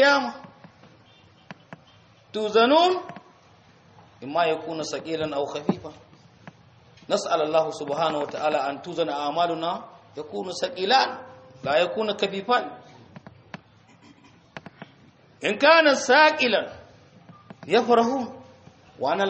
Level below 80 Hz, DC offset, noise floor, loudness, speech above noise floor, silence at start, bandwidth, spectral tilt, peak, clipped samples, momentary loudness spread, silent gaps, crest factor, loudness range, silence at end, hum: -68 dBFS; under 0.1%; -55 dBFS; -23 LUFS; 32 dB; 0 s; 8.2 kHz; -3.5 dB/octave; -4 dBFS; under 0.1%; 25 LU; none; 20 dB; 9 LU; 0 s; none